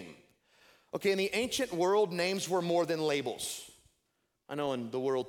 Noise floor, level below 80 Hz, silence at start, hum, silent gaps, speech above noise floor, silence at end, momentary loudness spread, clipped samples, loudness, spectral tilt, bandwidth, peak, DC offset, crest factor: -80 dBFS; -72 dBFS; 0 s; none; none; 48 dB; 0 s; 14 LU; under 0.1%; -32 LUFS; -4 dB/octave; 18 kHz; -16 dBFS; under 0.1%; 16 dB